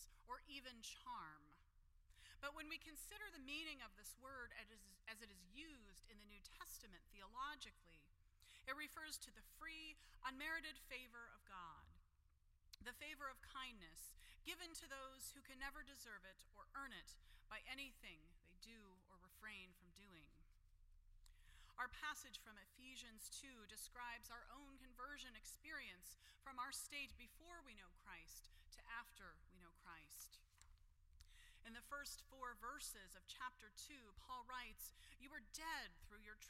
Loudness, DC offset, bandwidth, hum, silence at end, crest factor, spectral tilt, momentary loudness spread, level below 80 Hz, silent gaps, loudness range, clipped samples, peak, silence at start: -56 LUFS; under 0.1%; 16 kHz; none; 0 s; 24 dB; -1 dB/octave; 14 LU; -70 dBFS; none; 6 LU; under 0.1%; -34 dBFS; 0 s